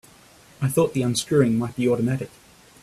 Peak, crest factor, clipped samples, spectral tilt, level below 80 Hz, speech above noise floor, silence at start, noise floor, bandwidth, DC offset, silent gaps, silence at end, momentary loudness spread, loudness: -6 dBFS; 18 dB; under 0.1%; -6 dB/octave; -56 dBFS; 30 dB; 0.6 s; -51 dBFS; 15.5 kHz; under 0.1%; none; 0.55 s; 9 LU; -22 LUFS